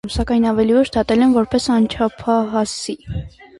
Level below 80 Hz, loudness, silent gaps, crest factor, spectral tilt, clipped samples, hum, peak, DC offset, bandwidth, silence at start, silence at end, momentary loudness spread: -36 dBFS; -17 LUFS; none; 14 dB; -5.5 dB/octave; under 0.1%; none; -4 dBFS; under 0.1%; 11.5 kHz; 0.05 s; 0.3 s; 11 LU